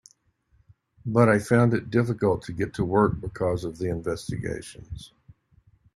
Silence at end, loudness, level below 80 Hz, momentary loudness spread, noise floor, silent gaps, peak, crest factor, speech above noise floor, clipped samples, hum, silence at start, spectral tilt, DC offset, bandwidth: 0.9 s; -25 LUFS; -50 dBFS; 18 LU; -65 dBFS; none; -4 dBFS; 22 dB; 41 dB; under 0.1%; none; 1.05 s; -7.5 dB/octave; under 0.1%; 12.5 kHz